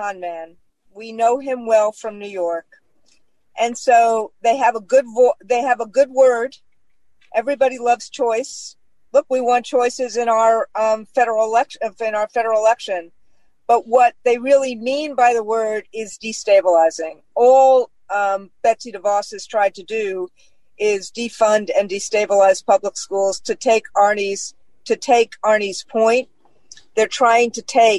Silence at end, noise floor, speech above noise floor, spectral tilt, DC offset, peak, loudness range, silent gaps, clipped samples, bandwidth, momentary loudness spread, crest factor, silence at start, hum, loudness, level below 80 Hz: 0 s; -67 dBFS; 50 dB; -2.5 dB/octave; 0.3%; -4 dBFS; 4 LU; none; under 0.1%; 11.5 kHz; 12 LU; 14 dB; 0 s; none; -18 LUFS; -68 dBFS